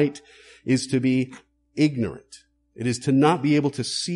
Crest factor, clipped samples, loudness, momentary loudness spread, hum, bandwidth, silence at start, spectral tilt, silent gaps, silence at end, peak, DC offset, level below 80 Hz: 18 dB; under 0.1%; -23 LUFS; 17 LU; none; 11.5 kHz; 0 s; -5.5 dB/octave; none; 0 s; -6 dBFS; under 0.1%; -60 dBFS